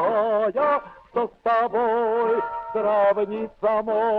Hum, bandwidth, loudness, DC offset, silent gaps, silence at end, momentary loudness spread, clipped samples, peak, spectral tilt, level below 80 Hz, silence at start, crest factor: none; 5.2 kHz; -23 LUFS; under 0.1%; none; 0 s; 7 LU; under 0.1%; -10 dBFS; -7.5 dB/octave; -60 dBFS; 0 s; 12 dB